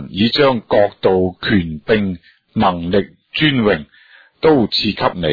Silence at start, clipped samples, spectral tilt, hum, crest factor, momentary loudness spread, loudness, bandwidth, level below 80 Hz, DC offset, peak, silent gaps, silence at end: 0 s; under 0.1%; -7.5 dB/octave; none; 14 dB; 7 LU; -16 LUFS; 5 kHz; -44 dBFS; under 0.1%; -2 dBFS; none; 0 s